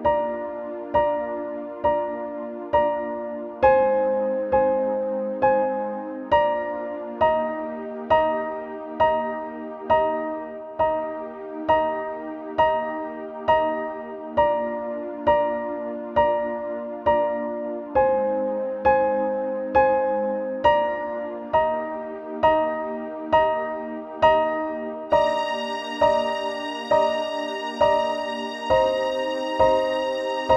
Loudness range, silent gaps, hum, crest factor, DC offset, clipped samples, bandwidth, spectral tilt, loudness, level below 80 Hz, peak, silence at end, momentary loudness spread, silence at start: 3 LU; none; none; 18 dB; under 0.1%; under 0.1%; 9 kHz; -5.5 dB/octave; -23 LUFS; -50 dBFS; -4 dBFS; 0 s; 11 LU; 0 s